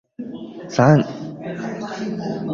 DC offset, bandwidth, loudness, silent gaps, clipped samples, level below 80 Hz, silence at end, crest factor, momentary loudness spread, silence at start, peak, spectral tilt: under 0.1%; 7.4 kHz; -21 LUFS; none; under 0.1%; -56 dBFS; 0 s; 20 dB; 18 LU; 0.2 s; -2 dBFS; -7.5 dB/octave